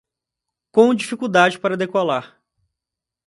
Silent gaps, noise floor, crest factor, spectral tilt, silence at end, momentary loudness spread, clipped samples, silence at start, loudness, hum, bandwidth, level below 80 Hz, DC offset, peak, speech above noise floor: none; -86 dBFS; 20 dB; -5 dB/octave; 1 s; 7 LU; under 0.1%; 0.75 s; -18 LUFS; none; 11.5 kHz; -68 dBFS; under 0.1%; 0 dBFS; 69 dB